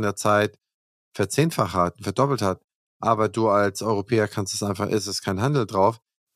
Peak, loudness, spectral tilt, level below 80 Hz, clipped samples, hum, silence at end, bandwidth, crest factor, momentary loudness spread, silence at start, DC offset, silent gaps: -4 dBFS; -23 LUFS; -5.5 dB/octave; -60 dBFS; under 0.1%; none; 0.4 s; 15.5 kHz; 18 dB; 7 LU; 0 s; under 0.1%; 0.74-1.12 s, 2.64-2.68 s, 2.75-3.00 s